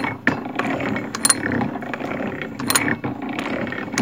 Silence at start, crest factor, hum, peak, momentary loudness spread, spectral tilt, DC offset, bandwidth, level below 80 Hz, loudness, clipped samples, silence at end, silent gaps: 0 s; 24 dB; none; 0 dBFS; 9 LU; -3 dB/octave; 0.2%; 17 kHz; -54 dBFS; -22 LUFS; under 0.1%; 0 s; none